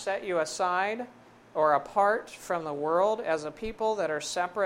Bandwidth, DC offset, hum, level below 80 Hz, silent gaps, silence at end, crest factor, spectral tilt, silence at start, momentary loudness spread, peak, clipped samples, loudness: 16 kHz; under 0.1%; none; -60 dBFS; none; 0 s; 18 dB; -3.5 dB/octave; 0 s; 8 LU; -10 dBFS; under 0.1%; -29 LUFS